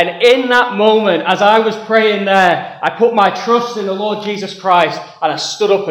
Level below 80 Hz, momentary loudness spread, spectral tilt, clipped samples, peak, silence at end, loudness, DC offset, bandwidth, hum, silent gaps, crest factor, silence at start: -62 dBFS; 9 LU; -4 dB/octave; under 0.1%; 0 dBFS; 0 s; -13 LUFS; under 0.1%; 14 kHz; none; none; 12 dB; 0 s